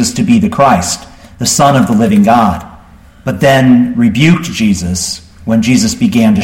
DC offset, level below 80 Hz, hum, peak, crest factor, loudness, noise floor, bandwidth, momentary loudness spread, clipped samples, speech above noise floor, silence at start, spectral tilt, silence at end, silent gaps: under 0.1%; -36 dBFS; none; 0 dBFS; 10 dB; -10 LUFS; -38 dBFS; 16.5 kHz; 10 LU; under 0.1%; 29 dB; 0 s; -5 dB/octave; 0 s; none